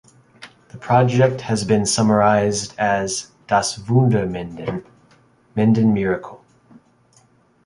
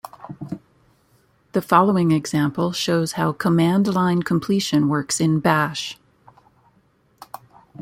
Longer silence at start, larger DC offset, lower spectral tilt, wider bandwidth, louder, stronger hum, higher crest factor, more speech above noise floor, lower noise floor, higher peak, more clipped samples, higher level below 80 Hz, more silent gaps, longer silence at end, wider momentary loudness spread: first, 0.4 s vs 0.2 s; neither; about the same, -5.5 dB/octave vs -5.5 dB/octave; second, 11.5 kHz vs 16.5 kHz; about the same, -19 LUFS vs -20 LUFS; neither; about the same, 18 dB vs 20 dB; about the same, 38 dB vs 41 dB; second, -56 dBFS vs -60 dBFS; about the same, -2 dBFS vs -2 dBFS; neither; first, -50 dBFS vs -60 dBFS; neither; second, 1.3 s vs 1.85 s; second, 13 LU vs 20 LU